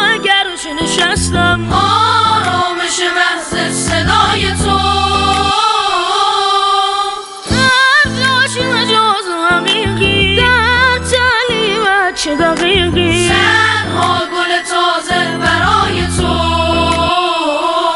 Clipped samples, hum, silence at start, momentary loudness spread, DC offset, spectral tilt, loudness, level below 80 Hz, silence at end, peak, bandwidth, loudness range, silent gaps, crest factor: under 0.1%; none; 0 s; 5 LU; under 0.1%; -3.5 dB/octave; -11 LUFS; -30 dBFS; 0 s; 0 dBFS; 11.5 kHz; 2 LU; none; 12 dB